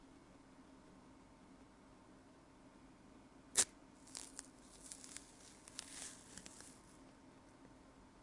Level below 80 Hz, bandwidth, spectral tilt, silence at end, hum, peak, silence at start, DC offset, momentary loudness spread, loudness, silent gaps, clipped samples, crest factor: -74 dBFS; 12 kHz; -0.5 dB/octave; 0 s; none; -14 dBFS; 0 s; under 0.1%; 24 LU; -44 LUFS; none; under 0.1%; 36 dB